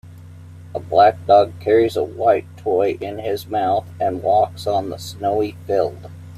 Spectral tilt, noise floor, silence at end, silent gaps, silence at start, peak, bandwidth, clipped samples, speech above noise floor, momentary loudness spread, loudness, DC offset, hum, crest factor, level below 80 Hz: -6.5 dB/octave; -39 dBFS; 0 s; none; 0.05 s; -2 dBFS; 15 kHz; under 0.1%; 21 dB; 11 LU; -19 LUFS; under 0.1%; none; 16 dB; -58 dBFS